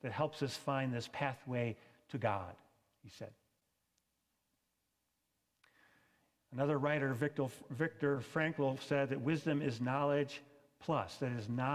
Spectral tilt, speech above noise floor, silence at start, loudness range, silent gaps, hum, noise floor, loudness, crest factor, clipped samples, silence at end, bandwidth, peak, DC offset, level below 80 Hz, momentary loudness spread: -6.5 dB/octave; 47 dB; 0.05 s; 10 LU; none; none; -84 dBFS; -38 LUFS; 20 dB; under 0.1%; 0 s; 15 kHz; -20 dBFS; under 0.1%; -72 dBFS; 13 LU